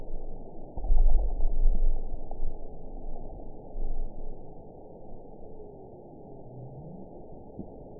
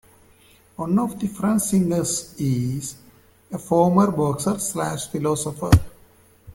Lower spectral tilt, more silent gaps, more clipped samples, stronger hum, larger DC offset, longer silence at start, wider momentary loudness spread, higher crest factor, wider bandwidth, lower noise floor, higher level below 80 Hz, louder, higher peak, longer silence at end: first, -15.5 dB/octave vs -6 dB/octave; neither; neither; neither; first, 0.2% vs under 0.1%; second, 0 s vs 0.8 s; first, 17 LU vs 12 LU; second, 16 dB vs 22 dB; second, 1 kHz vs 17 kHz; second, -47 dBFS vs -54 dBFS; first, -28 dBFS vs -40 dBFS; second, -38 LUFS vs -22 LUFS; second, -10 dBFS vs 0 dBFS; about the same, 0 s vs 0 s